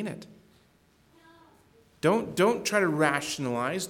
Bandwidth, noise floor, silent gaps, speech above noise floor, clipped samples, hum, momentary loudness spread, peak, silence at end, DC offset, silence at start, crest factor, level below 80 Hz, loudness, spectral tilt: 19 kHz; -63 dBFS; none; 36 dB; under 0.1%; none; 7 LU; -10 dBFS; 0 s; under 0.1%; 0 s; 20 dB; -68 dBFS; -26 LUFS; -4.5 dB/octave